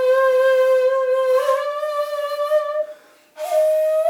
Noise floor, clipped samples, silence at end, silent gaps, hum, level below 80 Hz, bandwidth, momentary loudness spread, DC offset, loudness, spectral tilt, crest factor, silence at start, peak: -42 dBFS; under 0.1%; 0 s; none; none; -82 dBFS; 16.5 kHz; 9 LU; under 0.1%; -19 LUFS; 0.5 dB/octave; 12 dB; 0 s; -8 dBFS